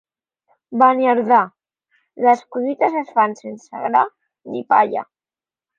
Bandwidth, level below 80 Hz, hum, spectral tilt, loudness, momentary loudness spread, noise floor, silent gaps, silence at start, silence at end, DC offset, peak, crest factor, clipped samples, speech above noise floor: 7.4 kHz; -76 dBFS; none; -6 dB/octave; -18 LUFS; 14 LU; under -90 dBFS; none; 0.7 s; 0.75 s; under 0.1%; -2 dBFS; 16 dB; under 0.1%; over 73 dB